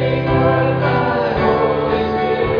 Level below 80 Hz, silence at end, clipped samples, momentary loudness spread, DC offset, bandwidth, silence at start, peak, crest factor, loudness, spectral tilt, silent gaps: -36 dBFS; 0 s; under 0.1%; 3 LU; under 0.1%; 5.4 kHz; 0 s; -2 dBFS; 14 dB; -16 LUFS; -9 dB/octave; none